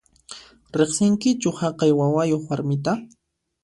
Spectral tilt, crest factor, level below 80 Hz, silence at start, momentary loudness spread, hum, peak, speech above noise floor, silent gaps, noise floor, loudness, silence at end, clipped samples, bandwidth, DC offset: -6 dB/octave; 18 dB; -58 dBFS; 0.3 s; 21 LU; none; -6 dBFS; 23 dB; none; -44 dBFS; -22 LUFS; 0.55 s; under 0.1%; 11.5 kHz; under 0.1%